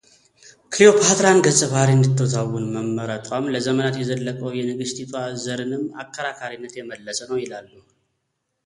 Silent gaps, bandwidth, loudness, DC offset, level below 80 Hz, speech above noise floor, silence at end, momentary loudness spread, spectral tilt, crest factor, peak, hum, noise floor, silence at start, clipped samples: none; 11.5 kHz; -20 LUFS; under 0.1%; -60 dBFS; 55 dB; 1.05 s; 16 LU; -4.5 dB/octave; 20 dB; 0 dBFS; none; -75 dBFS; 0.7 s; under 0.1%